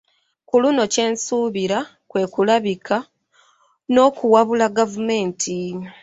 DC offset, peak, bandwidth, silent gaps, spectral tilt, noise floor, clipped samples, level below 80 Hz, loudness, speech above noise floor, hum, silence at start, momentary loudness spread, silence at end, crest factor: under 0.1%; -2 dBFS; 8.2 kHz; none; -4 dB/octave; -58 dBFS; under 0.1%; -62 dBFS; -19 LUFS; 40 dB; none; 0.55 s; 9 LU; 0.1 s; 18 dB